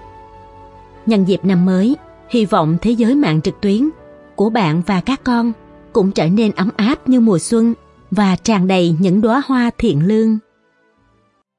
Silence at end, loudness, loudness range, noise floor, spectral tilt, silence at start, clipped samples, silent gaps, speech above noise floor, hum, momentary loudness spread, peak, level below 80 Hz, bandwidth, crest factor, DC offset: 1.2 s; -15 LUFS; 2 LU; -58 dBFS; -6.5 dB/octave; 0 s; under 0.1%; none; 45 dB; none; 7 LU; -2 dBFS; -44 dBFS; 11 kHz; 14 dB; under 0.1%